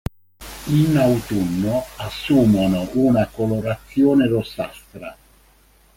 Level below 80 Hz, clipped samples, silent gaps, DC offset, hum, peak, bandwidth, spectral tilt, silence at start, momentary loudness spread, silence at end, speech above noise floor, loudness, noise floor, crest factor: -44 dBFS; under 0.1%; none; under 0.1%; none; -4 dBFS; 17 kHz; -7 dB/octave; 0.4 s; 19 LU; 0.85 s; 35 dB; -19 LUFS; -54 dBFS; 16 dB